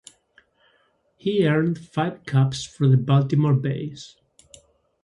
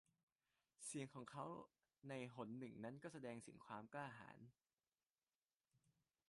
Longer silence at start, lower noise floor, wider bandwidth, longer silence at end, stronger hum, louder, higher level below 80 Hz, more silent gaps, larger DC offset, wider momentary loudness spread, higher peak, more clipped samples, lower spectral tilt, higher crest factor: first, 1.25 s vs 0.8 s; second, -65 dBFS vs under -90 dBFS; about the same, 11 kHz vs 11.5 kHz; first, 0.95 s vs 0.5 s; neither; first, -22 LUFS vs -55 LUFS; first, -60 dBFS vs under -90 dBFS; second, none vs 5.12-5.16 s, 5.35-5.49 s, 5.56-5.60 s; neither; first, 12 LU vs 9 LU; first, -8 dBFS vs -38 dBFS; neither; first, -7.5 dB/octave vs -5 dB/octave; about the same, 16 dB vs 20 dB